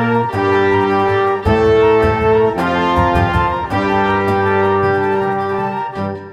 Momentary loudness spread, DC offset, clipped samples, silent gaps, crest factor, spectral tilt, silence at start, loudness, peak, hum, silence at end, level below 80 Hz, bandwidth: 6 LU; under 0.1%; under 0.1%; none; 12 dB; -7.5 dB/octave; 0 s; -14 LUFS; -2 dBFS; none; 0 s; -34 dBFS; 12 kHz